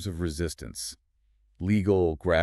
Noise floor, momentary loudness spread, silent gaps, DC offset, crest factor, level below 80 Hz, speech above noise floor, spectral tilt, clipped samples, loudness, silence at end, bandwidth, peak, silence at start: -67 dBFS; 12 LU; none; under 0.1%; 18 dB; -44 dBFS; 40 dB; -6 dB/octave; under 0.1%; -28 LUFS; 0 s; 13.5 kHz; -10 dBFS; 0 s